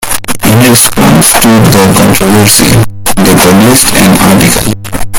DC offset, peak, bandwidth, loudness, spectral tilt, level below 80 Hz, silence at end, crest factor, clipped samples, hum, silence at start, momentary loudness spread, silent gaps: under 0.1%; 0 dBFS; over 20 kHz; -4 LUFS; -4 dB/octave; -24 dBFS; 0 s; 4 dB; 10%; none; 0 s; 7 LU; none